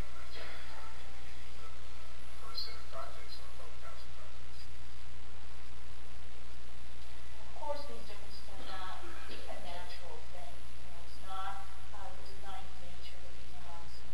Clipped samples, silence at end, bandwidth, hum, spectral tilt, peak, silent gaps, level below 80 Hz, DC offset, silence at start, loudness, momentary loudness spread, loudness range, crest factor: under 0.1%; 0 s; 16 kHz; none; -4 dB/octave; -20 dBFS; none; -52 dBFS; 6%; 0 s; -48 LUFS; 9 LU; 5 LU; 20 dB